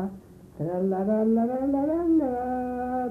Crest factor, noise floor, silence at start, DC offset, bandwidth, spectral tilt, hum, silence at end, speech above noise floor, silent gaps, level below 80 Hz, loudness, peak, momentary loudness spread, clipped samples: 12 dB; -46 dBFS; 0 s; under 0.1%; 3.1 kHz; -10.5 dB/octave; none; 0 s; 21 dB; none; -52 dBFS; -26 LUFS; -14 dBFS; 7 LU; under 0.1%